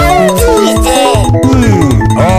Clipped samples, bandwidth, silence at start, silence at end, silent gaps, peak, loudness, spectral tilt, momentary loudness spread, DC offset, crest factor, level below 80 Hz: under 0.1%; 16 kHz; 0 s; 0 s; none; 0 dBFS; -8 LUFS; -5.5 dB/octave; 1 LU; under 0.1%; 6 dB; -18 dBFS